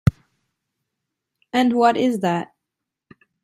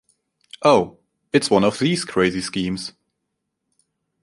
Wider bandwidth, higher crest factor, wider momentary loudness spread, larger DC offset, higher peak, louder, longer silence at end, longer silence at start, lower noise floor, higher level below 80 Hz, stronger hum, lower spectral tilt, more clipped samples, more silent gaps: first, 14.5 kHz vs 11.5 kHz; about the same, 22 dB vs 20 dB; about the same, 10 LU vs 12 LU; neither; about the same, -2 dBFS vs -2 dBFS; about the same, -20 LUFS vs -20 LUFS; second, 1 s vs 1.35 s; second, 0.05 s vs 0.6 s; first, -83 dBFS vs -77 dBFS; first, -46 dBFS vs -54 dBFS; neither; first, -7 dB/octave vs -5 dB/octave; neither; neither